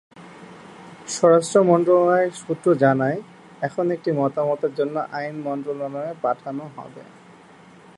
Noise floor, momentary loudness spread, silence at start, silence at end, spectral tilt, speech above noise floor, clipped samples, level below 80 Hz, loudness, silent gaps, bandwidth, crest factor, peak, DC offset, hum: -47 dBFS; 23 LU; 0.15 s; 0.95 s; -6 dB/octave; 27 dB; under 0.1%; -70 dBFS; -21 LUFS; none; 11.5 kHz; 18 dB; -4 dBFS; under 0.1%; none